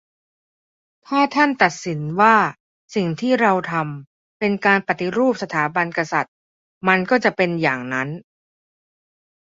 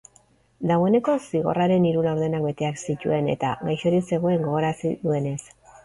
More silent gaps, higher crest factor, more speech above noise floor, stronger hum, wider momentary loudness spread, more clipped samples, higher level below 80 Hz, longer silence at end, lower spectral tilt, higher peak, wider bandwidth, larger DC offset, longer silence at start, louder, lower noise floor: first, 2.60-2.88 s, 4.07-4.40 s, 6.28-6.81 s vs none; first, 20 dB vs 14 dB; first, over 71 dB vs 36 dB; neither; about the same, 9 LU vs 7 LU; neither; second, -64 dBFS vs -58 dBFS; first, 1.25 s vs 0.4 s; second, -5.5 dB/octave vs -7 dB/octave; first, -2 dBFS vs -8 dBFS; second, 7.8 kHz vs 11.5 kHz; neither; first, 1.1 s vs 0.6 s; first, -19 LUFS vs -23 LUFS; first, under -90 dBFS vs -59 dBFS